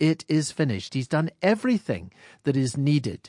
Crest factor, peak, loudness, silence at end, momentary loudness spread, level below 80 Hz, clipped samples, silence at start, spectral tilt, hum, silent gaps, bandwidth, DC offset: 18 dB; -8 dBFS; -25 LUFS; 0.1 s; 7 LU; -66 dBFS; under 0.1%; 0 s; -6 dB/octave; none; none; 11.5 kHz; under 0.1%